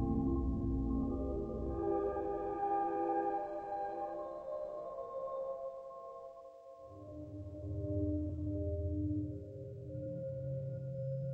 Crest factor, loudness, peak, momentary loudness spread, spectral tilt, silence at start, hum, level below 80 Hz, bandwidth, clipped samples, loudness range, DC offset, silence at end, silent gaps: 14 dB; -39 LUFS; -24 dBFS; 14 LU; -11 dB/octave; 0 s; none; -48 dBFS; 5.4 kHz; under 0.1%; 8 LU; under 0.1%; 0 s; none